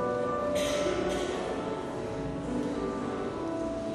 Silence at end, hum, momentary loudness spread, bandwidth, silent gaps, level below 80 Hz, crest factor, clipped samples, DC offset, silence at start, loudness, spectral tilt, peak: 0 s; none; 6 LU; 13.5 kHz; none; -50 dBFS; 14 dB; under 0.1%; under 0.1%; 0 s; -32 LUFS; -5 dB/octave; -18 dBFS